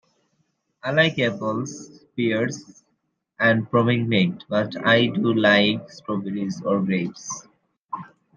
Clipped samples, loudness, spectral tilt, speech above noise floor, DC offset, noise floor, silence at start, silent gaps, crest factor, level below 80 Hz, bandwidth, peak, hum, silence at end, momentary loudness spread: under 0.1%; -22 LUFS; -5.5 dB/octave; 51 dB; under 0.1%; -73 dBFS; 0.85 s; 7.78-7.89 s; 20 dB; -66 dBFS; 7.4 kHz; -2 dBFS; none; 0.3 s; 17 LU